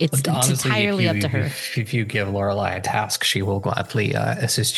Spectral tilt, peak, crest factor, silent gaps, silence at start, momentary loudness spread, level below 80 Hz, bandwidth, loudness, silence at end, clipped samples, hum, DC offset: -4 dB/octave; -4 dBFS; 16 dB; none; 0 s; 5 LU; -60 dBFS; 13 kHz; -21 LUFS; 0 s; under 0.1%; none; under 0.1%